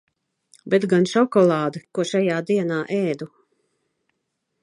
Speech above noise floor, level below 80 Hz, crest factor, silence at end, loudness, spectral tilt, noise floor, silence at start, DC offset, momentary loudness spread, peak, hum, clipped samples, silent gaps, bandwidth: 56 dB; -72 dBFS; 18 dB; 1.35 s; -21 LUFS; -6.5 dB/octave; -76 dBFS; 0.65 s; under 0.1%; 9 LU; -6 dBFS; none; under 0.1%; none; 11.5 kHz